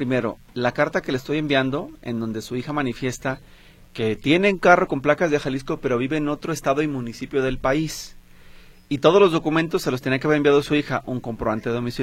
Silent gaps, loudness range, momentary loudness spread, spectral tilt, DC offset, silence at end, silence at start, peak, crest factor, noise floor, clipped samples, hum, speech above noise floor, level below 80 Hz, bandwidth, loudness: none; 5 LU; 12 LU; -5.5 dB/octave; under 0.1%; 0 s; 0 s; 0 dBFS; 22 dB; -45 dBFS; under 0.1%; none; 24 dB; -46 dBFS; 16 kHz; -22 LUFS